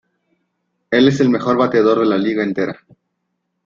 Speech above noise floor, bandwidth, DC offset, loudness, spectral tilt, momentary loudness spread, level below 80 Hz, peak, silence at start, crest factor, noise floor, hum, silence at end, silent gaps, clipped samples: 58 dB; 7.4 kHz; under 0.1%; -16 LUFS; -6.5 dB/octave; 9 LU; -56 dBFS; -2 dBFS; 0.9 s; 16 dB; -73 dBFS; none; 0.9 s; none; under 0.1%